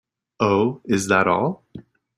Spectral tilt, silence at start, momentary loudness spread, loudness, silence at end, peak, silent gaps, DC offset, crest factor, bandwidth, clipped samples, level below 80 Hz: -5.5 dB/octave; 0.4 s; 7 LU; -20 LUFS; 0.35 s; -4 dBFS; none; under 0.1%; 18 dB; 15 kHz; under 0.1%; -58 dBFS